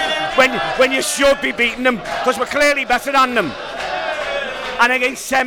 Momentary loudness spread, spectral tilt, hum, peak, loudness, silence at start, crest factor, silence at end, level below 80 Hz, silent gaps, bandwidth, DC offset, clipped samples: 8 LU; -2 dB/octave; none; -2 dBFS; -16 LUFS; 0 s; 16 dB; 0 s; -44 dBFS; none; 19.5 kHz; under 0.1%; under 0.1%